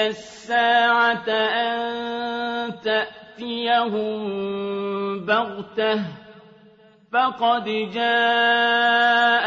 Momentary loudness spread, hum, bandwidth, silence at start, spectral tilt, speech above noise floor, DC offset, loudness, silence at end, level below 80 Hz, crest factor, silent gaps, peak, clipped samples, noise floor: 10 LU; none; 7.8 kHz; 0 s; -4.5 dB/octave; 31 dB; under 0.1%; -21 LUFS; 0 s; -68 dBFS; 16 dB; none; -6 dBFS; under 0.1%; -52 dBFS